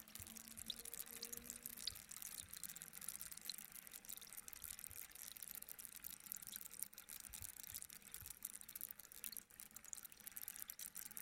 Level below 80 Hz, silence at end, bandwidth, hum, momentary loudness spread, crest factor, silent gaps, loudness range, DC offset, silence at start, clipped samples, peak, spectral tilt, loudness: -76 dBFS; 0 s; 17 kHz; none; 4 LU; 30 dB; none; 2 LU; under 0.1%; 0 s; under 0.1%; -24 dBFS; 0 dB/octave; -51 LUFS